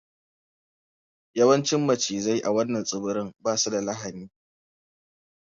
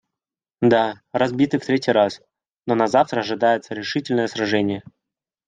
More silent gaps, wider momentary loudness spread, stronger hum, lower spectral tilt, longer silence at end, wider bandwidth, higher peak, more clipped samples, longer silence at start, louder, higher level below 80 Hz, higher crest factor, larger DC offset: neither; first, 13 LU vs 8 LU; neither; second, -4 dB/octave vs -6 dB/octave; first, 1.2 s vs 0.65 s; second, 7.8 kHz vs 9.4 kHz; second, -6 dBFS vs -2 dBFS; neither; first, 1.35 s vs 0.6 s; second, -25 LUFS vs -20 LUFS; about the same, -68 dBFS vs -64 dBFS; about the same, 20 dB vs 18 dB; neither